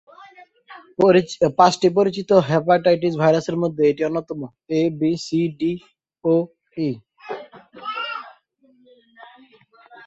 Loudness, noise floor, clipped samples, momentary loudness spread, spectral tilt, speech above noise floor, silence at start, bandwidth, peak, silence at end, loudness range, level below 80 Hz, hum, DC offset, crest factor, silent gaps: -19 LUFS; -58 dBFS; under 0.1%; 17 LU; -6.5 dB/octave; 39 dB; 0.2 s; 8.2 kHz; -2 dBFS; 1.75 s; 10 LU; -60 dBFS; none; under 0.1%; 20 dB; none